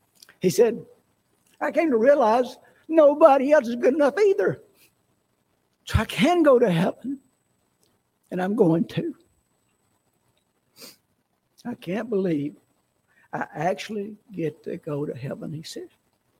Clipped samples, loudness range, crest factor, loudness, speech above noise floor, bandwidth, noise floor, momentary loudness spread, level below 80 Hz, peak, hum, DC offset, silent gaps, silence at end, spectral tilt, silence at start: under 0.1%; 13 LU; 22 dB; -22 LUFS; 50 dB; 16.5 kHz; -71 dBFS; 18 LU; -50 dBFS; -2 dBFS; 60 Hz at -50 dBFS; under 0.1%; none; 0.55 s; -6.5 dB/octave; 0.45 s